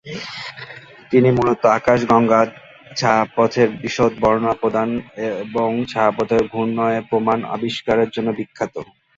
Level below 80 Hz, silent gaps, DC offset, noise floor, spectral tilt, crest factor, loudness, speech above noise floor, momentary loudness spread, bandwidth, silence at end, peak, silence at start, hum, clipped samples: -50 dBFS; none; under 0.1%; -38 dBFS; -6 dB/octave; 18 dB; -18 LUFS; 21 dB; 14 LU; 7.8 kHz; 0.35 s; -2 dBFS; 0.05 s; none; under 0.1%